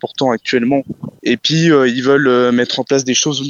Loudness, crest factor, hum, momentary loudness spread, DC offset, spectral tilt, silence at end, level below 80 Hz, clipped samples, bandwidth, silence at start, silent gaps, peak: -14 LUFS; 14 dB; none; 7 LU; under 0.1%; -4 dB/octave; 0 s; -58 dBFS; under 0.1%; 7.8 kHz; 0.05 s; none; 0 dBFS